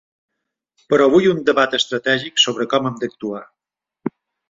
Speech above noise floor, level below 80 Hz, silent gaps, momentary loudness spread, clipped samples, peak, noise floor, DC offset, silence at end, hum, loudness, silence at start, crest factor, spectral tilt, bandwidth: 54 dB; -60 dBFS; none; 16 LU; under 0.1%; -2 dBFS; -71 dBFS; under 0.1%; 0.4 s; none; -17 LUFS; 0.9 s; 18 dB; -3.5 dB/octave; 7.8 kHz